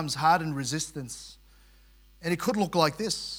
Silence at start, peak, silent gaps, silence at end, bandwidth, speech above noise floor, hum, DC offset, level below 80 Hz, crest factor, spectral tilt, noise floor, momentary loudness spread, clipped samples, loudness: 0 s; -8 dBFS; none; 0 s; 18 kHz; 29 dB; none; under 0.1%; -58 dBFS; 20 dB; -4 dB/octave; -57 dBFS; 15 LU; under 0.1%; -28 LUFS